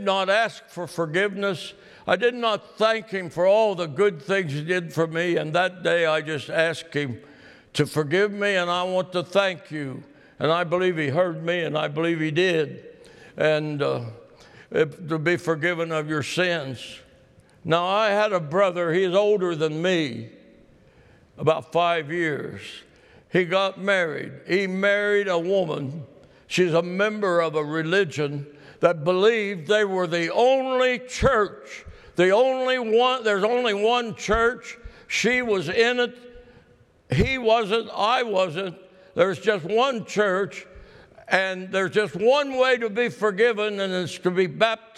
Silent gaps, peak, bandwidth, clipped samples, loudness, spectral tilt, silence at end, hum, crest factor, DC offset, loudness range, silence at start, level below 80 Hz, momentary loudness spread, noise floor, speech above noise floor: none; -2 dBFS; 13 kHz; under 0.1%; -23 LUFS; -5 dB/octave; 0.2 s; none; 20 dB; under 0.1%; 4 LU; 0 s; -50 dBFS; 11 LU; -57 dBFS; 34 dB